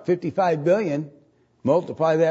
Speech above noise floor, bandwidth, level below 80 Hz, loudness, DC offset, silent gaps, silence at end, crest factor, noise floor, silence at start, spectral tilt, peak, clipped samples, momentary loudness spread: 23 dB; 8 kHz; -68 dBFS; -22 LUFS; under 0.1%; none; 0 s; 16 dB; -44 dBFS; 0 s; -7.5 dB/octave; -6 dBFS; under 0.1%; 9 LU